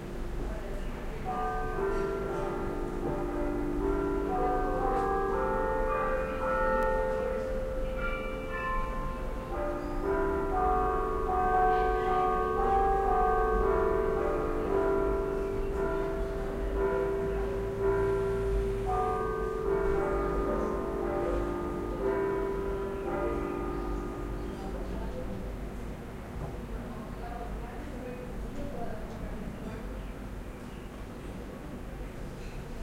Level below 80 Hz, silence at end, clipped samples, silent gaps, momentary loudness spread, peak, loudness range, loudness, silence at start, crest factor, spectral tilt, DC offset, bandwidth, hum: -38 dBFS; 0 s; under 0.1%; none; 13 LU; -16 dBFS; 12 LU; -32 LUFS; 0 s; 16 dB; -7.5 dB/octave; under 0.1%; 16 kHz; none